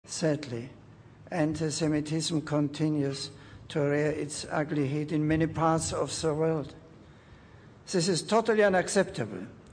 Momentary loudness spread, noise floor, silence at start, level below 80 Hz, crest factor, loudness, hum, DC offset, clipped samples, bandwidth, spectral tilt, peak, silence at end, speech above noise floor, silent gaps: 12 LU; -53 dBFS; 0.05 s; -58 dBFS; 18 dB; -29 LUFS; none; under 0.1%; under 0.1%; 10.5 kHz; -5 dB/octave; -12 dBFS; 0 s; 24 dB; none